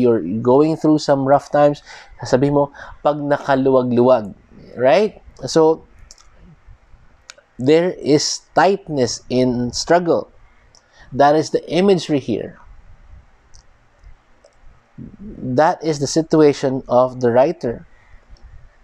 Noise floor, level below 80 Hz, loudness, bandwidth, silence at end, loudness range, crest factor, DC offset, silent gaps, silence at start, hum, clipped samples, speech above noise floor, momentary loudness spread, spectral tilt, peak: -51 dBFS; -48 dBFS; -17 LUFS; 11 kHz; 0.25 s; 6 LU; 16 dB; under 0.1%; none; 0 s; none; under 0.1%; 35 dB; 11 LU; -5.5 dB/octave; -2 dBFS